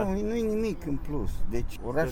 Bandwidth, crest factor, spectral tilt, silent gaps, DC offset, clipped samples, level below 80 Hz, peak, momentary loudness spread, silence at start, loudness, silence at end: 15.5 kHz; 14 dB; -7 dB/octave; none; under 0.1%; under 0.1%; -36 dBFS; -14 dBFS; 6 LU; 0 s; -31 LUFS; 0 s